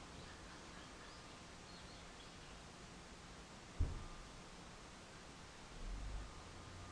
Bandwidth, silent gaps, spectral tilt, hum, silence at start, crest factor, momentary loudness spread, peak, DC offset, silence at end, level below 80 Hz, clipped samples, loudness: 11 kHz; none; -4 dB/octave; none; 0 s; 24 dB; 9 LU; -28 dBFS; under 0.1%; 0 s; -54 dBFS; under 0.1%; -54 LUFS